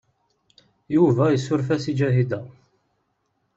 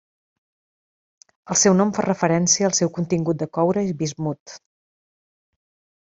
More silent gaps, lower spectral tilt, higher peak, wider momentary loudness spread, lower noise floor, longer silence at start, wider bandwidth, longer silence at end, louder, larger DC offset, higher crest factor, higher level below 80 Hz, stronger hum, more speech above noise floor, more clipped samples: second, none vs 4.40-4.46 s; first, -8 dB/octave vs -4 dB/octave; about the same, -6 dBFS vs -4 dBFS; about the same, 7 LU vs 9 LU; second, -72 dBFS vs under -90 dBFS; second, 0.9 s vs 1.45 s; about the same, 8 kHz vs 8.2 kHz; second, 1.05 s vs 1.5 s; about the same, -21 LUFS vs -20 LUFS; neither; about the same, 18 dB vs 20 dB; about the same, -60 dBFS vs -62 dBFS; neither; second, 51 dB vs over 70 dB; neither